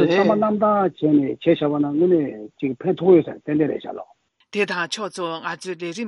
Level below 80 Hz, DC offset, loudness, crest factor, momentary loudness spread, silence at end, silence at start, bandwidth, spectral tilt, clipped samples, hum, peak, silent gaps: -64 dBFS; under 0.1%; -21 LUFS; 16 dB; 12 LU; 0 s; 0 s; 11.5 kHz; -6.5 dB/octave; under 0.1%; none; -4 dBFS; none